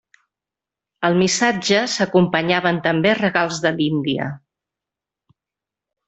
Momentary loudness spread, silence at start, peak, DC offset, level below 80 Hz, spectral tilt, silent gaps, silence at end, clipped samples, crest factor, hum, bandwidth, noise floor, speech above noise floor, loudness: 7 LU; 1 s; -2 dBFS; under 0.1%; -58 dBFS; -4.5 dB/octave; none; 1.7 s; under 0.1%; 18 dB; none; 8.4 kHz; -87 dBFS; 69 dB; -18 LUFS